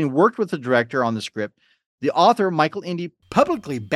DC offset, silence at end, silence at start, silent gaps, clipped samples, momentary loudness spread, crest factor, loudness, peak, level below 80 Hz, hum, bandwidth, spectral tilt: under 0.1%; 0 s; 0 s; 1.86-1.98 s; under 0.1%; 12 LU; 20 dB; -21 LUFS; -2 dBFS; -62 dBFS; none; 13 kHz; -6 dB/octave